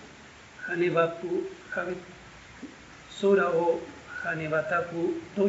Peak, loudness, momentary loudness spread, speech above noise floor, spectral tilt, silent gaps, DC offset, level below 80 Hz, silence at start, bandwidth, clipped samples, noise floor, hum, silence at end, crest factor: -10 dBFS; -28 LUFS; 23 LU; 22 dB; -4.5 dB/octave; none; under 0.1%; -62 dBFS; 0 s; 8 kHz; under 0.1%; -50 dBFS; none; 0 s; 18 dB